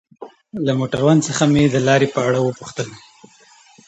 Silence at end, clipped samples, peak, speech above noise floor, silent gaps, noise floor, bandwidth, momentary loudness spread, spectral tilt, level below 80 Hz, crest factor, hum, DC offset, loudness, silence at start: 0.9 s; under 0.1%; -2 dBFS; 33 dB; none; -49 dBFS; 8.8 kHz; 14 LU; -5.5 dB/octave; -52 dBFS; 16 dB; none; under 0.1%; -17 LUFS; 0.2 s